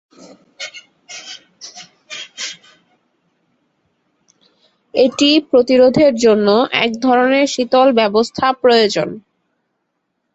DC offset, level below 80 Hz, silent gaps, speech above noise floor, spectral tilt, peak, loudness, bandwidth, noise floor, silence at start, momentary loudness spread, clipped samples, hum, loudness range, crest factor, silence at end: under 0.1%; -58 dBFS; none; 58 dB; -4 dB/octave; -2 dBFS; -13 LUFS; 8.2 kHz; -71 dBFS; 0.6 s; 21 LU; under 0.1%; none; 20 LU; 16 dB; 1.15 s